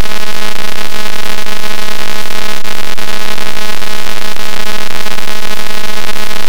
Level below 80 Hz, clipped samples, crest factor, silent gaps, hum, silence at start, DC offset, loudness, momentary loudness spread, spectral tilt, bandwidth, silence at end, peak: -40 dBFS; 50%; 22 dB; none; none; 0 s; 100%; -19 LUFS; 1 LU; -3 dB/octave; over 20 kHz; 0 s; 0 dBFS